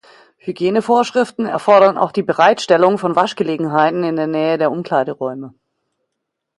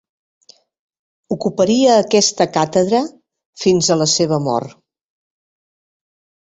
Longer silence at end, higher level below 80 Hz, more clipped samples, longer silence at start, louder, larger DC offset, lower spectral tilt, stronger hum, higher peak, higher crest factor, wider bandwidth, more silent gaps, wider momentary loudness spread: second, 1.1 s vs 1.75 s; second, -64 dBFS vs -58 dBFS; neither; second, 0.45 s vs 1.3 s; about the same, -15 LUFS vs -15 LUFS; neither; first, -5.5 dB/octave vs -4 dB/octave; neither; about the same, 0 dBFS vs -2 dBFS; about the same, 16 dB vs 16 dB; first, 11.5 kHz vs 8.4 kHz; second, none vs 3.46-3.53 s; about the same, 10 LU vs 10 LU